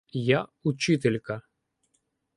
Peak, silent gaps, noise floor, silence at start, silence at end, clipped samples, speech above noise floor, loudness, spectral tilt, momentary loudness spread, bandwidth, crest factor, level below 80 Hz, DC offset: -8 dBFS; none; -75 dBFS; 0.15 s; 0.95 s; under 0.1%; 49 dB; -26 LUFS; -6 dB/octave; 11 LU; 11.5 kHz; 22 dB; -64 dBFS; under 0.1%